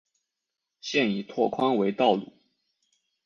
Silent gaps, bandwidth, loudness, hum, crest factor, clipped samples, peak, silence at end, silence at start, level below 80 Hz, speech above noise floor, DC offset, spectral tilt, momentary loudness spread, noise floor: none; 7.4 kHz; -26 LUFS; none; 20 dB; under 0.1%; -8 dBFS; 1 s; 0.85 s; -72 dBFS; 60 dB; under 0.1%; -5.5 dB/octave; 6 LU; -85 dBFS